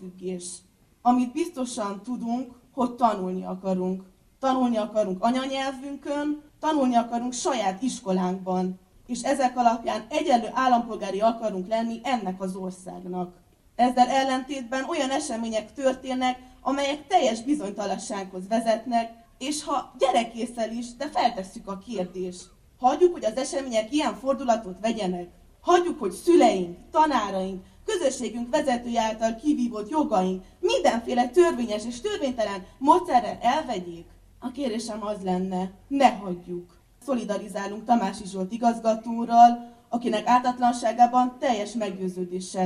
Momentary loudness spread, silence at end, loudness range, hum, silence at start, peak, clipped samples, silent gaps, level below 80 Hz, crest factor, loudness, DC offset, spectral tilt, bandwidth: 12 LU; 0 s; 5 LU; none; 0 s; -4 dBFS; under 0.1%; none; -58 dBFS; 22 dB; -25 LUFS; under 0.1%; -5 dB/octave; 13 kHz